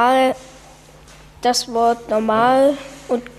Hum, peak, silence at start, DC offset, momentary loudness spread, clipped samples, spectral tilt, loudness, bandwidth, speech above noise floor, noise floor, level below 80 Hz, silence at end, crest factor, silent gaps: none; -4 dBFS; 0 s; under 0.1%; 10 LU; under 0.1%; -3.5 dB/octave; -17 LUFS; 14.5 kHz; 27 dB; -44 dBFS; -50 dBFS; 0.05 s; 14 dB; none